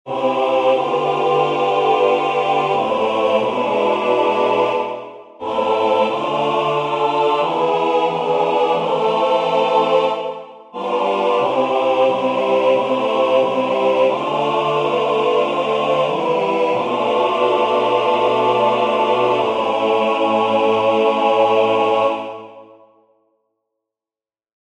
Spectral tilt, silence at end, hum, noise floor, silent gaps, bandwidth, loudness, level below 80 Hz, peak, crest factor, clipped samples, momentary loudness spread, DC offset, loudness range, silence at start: -5.5 dB/octave; 2.1 s; none; under -90 dBFS; none; 9.6 kHz; -17 LUFS; -64 dBFS; -4 dBFS; 14 dB; under 0.1%; 4 LU; under 0.1%; 2 LU; 0.05 s